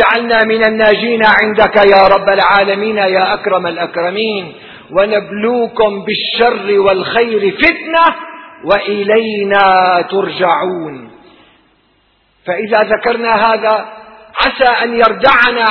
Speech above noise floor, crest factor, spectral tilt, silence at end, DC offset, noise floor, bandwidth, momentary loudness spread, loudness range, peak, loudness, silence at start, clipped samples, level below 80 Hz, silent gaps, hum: 43 dB; 12 dB; -6.5 dB/octave; 0 s; under 0.1%; -55 dBFS; 5.4 kHz; 10 LU; 6 LU; 0 dBFS; -11 LUFS; 0 s; 0.2%; -44 dBFS; none; none